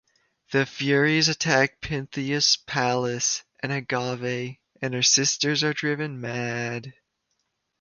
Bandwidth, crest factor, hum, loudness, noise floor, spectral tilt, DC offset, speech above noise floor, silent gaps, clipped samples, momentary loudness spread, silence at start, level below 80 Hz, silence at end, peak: 10.5 kHz; 20 dB; none; -24 LUFS; -76 dBFS; -3 dB/octave; under 0.1%; 51 dB; none; under 0.1%; 11 LU; 0.5 s; -58 dBFS; 0.9 s; -6 dBFS